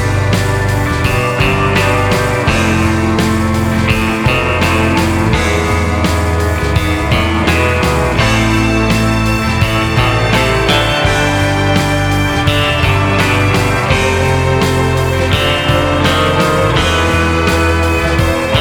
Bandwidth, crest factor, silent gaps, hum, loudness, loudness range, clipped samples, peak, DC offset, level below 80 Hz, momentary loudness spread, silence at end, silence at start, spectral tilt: over 20 kHz; 12 dB; none; none; -12 LUFS; 1 LU; under 0.1%; 0 dBFS; under 0.1%; -22 dBFS; 2 LU; 0 s; 0 s; -5 dB/octave